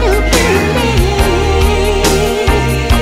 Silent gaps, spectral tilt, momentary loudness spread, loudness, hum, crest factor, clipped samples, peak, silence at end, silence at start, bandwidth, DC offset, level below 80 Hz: none; -4.5 dB/octave; 2 LU; -12 LUFS; none; 10 dB; under 0.1%; 0 dBFS; 0 s; 0 s; 16 kHz; under 0.1%; -16 dBFS